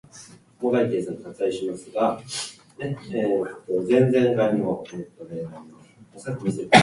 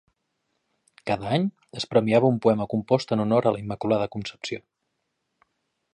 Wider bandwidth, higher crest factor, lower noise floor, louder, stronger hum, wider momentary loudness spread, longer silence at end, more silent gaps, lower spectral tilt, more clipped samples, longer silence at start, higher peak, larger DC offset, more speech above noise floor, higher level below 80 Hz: about the same, 11.5 kHz vs 10.5 kHz; about the same, 24 dB vs 20 dB; second, -48 dBFS vs -78 dBFS; about the same, -24 LUFS vs -24 LUFS; neither; first, 18 LU vs 13 LU; second, 0 s vs 1.35 s; neither; second, -5.5 dB/octave vs -7 dB/octave; neither; second, 0.15 s vs 1.05 s; first, 0 dBFS vs -6 dBFS; neither; second, 25 dB vs 54 dB; about the same, -62 dBFS vs -60 dBFS